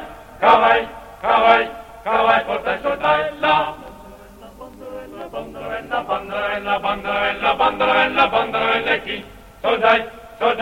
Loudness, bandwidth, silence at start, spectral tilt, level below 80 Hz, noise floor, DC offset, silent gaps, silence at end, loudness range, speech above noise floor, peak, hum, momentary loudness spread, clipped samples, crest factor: -18 LUFS; 16.5 kHz; 0 s; -4.5 dB/octave; -48 dBFS; -41 dBFS; under 0.1%; none; 0 s; 8 LU; 24 dB; 0 dBFS; none; 18 LU; under 0.1%; 20 dB